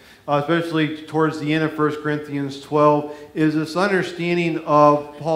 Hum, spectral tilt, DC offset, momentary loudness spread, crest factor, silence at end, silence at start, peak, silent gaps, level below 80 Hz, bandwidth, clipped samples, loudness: none; -7 dB/octave; under 0.1%; 9 LU; 18 dB; 0 s; 0.25 s; -2 dBFS; none; -62 dBFS; 13.5 kHz; under 0.1%; -20 LUFS